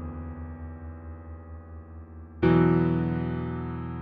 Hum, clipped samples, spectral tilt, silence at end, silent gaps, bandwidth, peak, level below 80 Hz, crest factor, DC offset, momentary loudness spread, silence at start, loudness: none; under 0.1%; -11 dB/octave; 0 s; none; 4.7 kHz; -10 dBFS; -44 dBFS; 18 dB; under 0.1%; 23 LU; 0 s; -26 LUFS